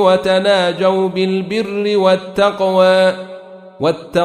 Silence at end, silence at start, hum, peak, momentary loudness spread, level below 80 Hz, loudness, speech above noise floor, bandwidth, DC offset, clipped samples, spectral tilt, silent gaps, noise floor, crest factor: 0 s; 0 s; none; -2 dBFS; 8 LU; -52 dBFS; -14 LUFS; 21 dB; 11.5 kHz; under 0.1%; under 0.1%; -5.5 dB/octave; none; -34 dBFS; 14 dB